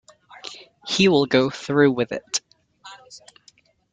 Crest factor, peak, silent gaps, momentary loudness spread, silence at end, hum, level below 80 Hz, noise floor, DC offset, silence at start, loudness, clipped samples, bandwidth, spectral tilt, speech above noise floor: 20 dB; -4 dBFS; none; 21 LU; 0.75 s; none; -60 dBFS; -57 dBFS; under 0.1%; 0.45 s; -20 LUFS; under 0.1%; 9.6 kHz; -4.5 dB/octave; 38 dB